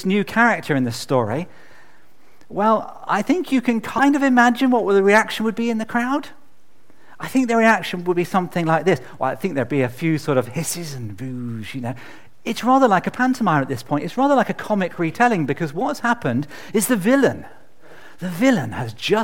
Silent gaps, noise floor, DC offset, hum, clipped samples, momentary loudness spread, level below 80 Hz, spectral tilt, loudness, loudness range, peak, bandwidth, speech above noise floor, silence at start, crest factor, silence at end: none; -59 dBFS; 1%; none; under 0.1%; 13 LU; -60 dBFS; -5.5 dB/octave; -19 LUFS; 5 LU; 0 dBFS; 17 kHz; 39 dB; 0 s; 20 dB; 0 s